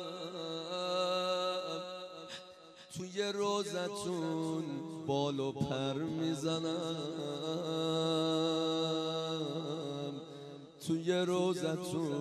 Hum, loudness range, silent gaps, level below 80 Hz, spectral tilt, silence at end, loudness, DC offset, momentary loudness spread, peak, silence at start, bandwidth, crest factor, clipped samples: none; 3 LU; none; -74 dBFS; -5 dB/octave; 0 s; -36 LUFS; under 0.1%; 13 LU; -20 dBFS; 0 s; 13 kHz; 16 dB; under 0.1%